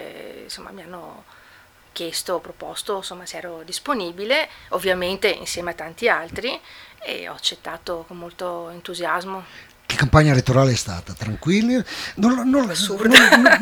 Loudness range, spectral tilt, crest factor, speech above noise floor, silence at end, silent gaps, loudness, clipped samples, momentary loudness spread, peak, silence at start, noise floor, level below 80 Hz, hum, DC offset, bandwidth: 10 LU; -4.5 dB/octave; 20 dB; 30 dB; 0 s; none; -19 LUFS; under 0.1%; 20 LU; 0 dBFS; 0 s; -50 dBFS; -44 dBFS; none; under 0.1%; over 20 kHz